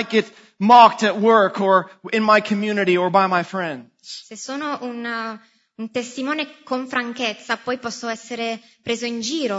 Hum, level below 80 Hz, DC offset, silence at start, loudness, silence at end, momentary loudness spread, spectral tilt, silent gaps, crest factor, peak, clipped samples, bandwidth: none; -72 dBFS; under 0.1%; 0 s; -19 LUFS; 0 s; 16 LU; -4.5 dB/octave; none; 20 dB; 0 dBFS; under 0.1%; 8 kHz